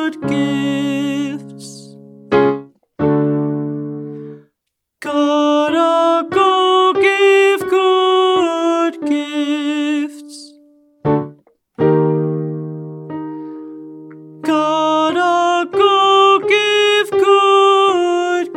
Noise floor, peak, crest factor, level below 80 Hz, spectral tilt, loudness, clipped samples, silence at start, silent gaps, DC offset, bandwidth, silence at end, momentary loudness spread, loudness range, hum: -76 dBFS; 0 dBFS; 16 dB; -56 dBFS; -5.5 dB/octave; -14 LUFS; under 0.1%; 0 s; none; under 0.1%; 13 kHz; 0 s; 18 LU; 8 LU; none